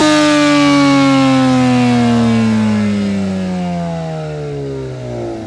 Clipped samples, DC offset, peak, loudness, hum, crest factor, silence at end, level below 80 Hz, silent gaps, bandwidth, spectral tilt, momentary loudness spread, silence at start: under 0.1%; under 0.1%; 0 dBFS; -13 LUFS; none; 12 dB; 0 s; -44 dBFS; none; 12 kHz; -5.5 dB/octave; 13 LU; 0 s